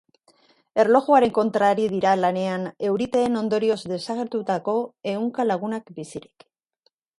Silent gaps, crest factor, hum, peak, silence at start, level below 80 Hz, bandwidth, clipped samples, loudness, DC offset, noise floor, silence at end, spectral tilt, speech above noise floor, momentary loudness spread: none; 20 dB; none; -4 dBFS; 0.75 s; -64 dBFS; 11.5 kHz; under 0.1%; -22 LUFS; under 0.1%; -69 dBFS; 1 s; -6 dB/octave; 48 dB; 11 LU